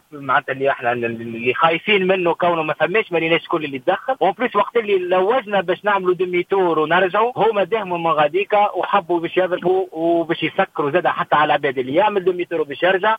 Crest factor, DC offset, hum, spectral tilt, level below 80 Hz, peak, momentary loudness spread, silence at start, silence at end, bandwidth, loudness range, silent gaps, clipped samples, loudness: 16 dB; under 0.1%; none; -7 dB/octave; -66 dBFS; -2 dBFS; 5 LU; 0.15 s; 0 s; 5 kHz; 1 LU; none; under 0.1%; -18 LUFS